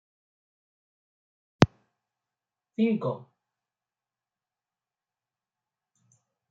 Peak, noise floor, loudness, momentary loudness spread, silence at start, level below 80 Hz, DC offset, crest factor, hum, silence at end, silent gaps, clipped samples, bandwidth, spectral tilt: -2 dBFS; under -90 dBFS; -27 LUFS; 15 LU; 1.6 s; -62 dBFS; under 0.1%; 32 dB; none; 3.3 s; none; under 0.1%; 7.4 kHz; -7 dB/octave